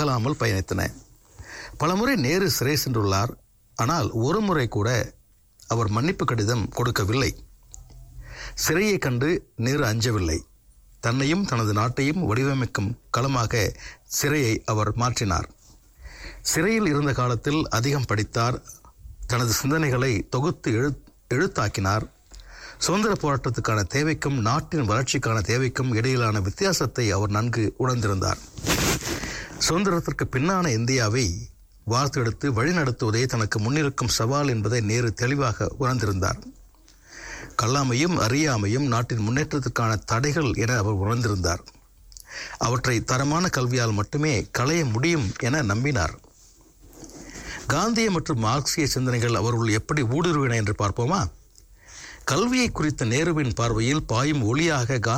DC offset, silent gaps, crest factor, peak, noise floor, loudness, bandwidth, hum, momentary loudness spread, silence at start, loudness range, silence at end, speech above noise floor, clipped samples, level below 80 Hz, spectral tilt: under 0.1%; none; 12 dB; -12 dBFS; -54 dBFS; -24 LUFS; 19.5 kHz; none; 7 LU; 0 s; 2 LU; 0 s; 31 dB; under 0.1%; -44 dBFS; -5 dB/octave